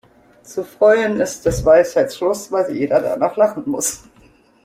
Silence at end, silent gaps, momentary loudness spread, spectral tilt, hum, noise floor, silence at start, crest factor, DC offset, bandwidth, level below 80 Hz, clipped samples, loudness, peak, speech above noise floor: 0.7 s; none; 11 LU; -4.5 dB/octave; none; -51 dBFS; 0.5 s; 16 dB; under 0.1%; 16 kHz; -42 dBFS; under 0.1%; -17 LUFS; -2 dBFS; 34 dB